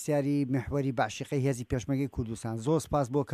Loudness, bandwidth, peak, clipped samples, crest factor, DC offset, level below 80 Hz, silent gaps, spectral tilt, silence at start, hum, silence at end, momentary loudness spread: -31 LUFS; 14.5 kHz; -14 dBFS; under 0.1%; 16 dB; under 0.1%; -50 dBFS; none; -6.5 dB/octave; 0 s; none; 0 s; 6 LU